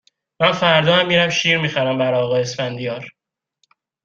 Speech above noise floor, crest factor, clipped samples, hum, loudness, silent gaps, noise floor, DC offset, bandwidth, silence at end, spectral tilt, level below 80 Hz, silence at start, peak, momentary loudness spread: 50 dB; 18 dB; under 0.1%; none; -17 LUFS; none; -68 dBFS; under 0.1%; 7.6 kHz; 0.95 s; -4.5 dB/octave; -58 dBFS; 0.4 s; -2 dBFS; 12 LU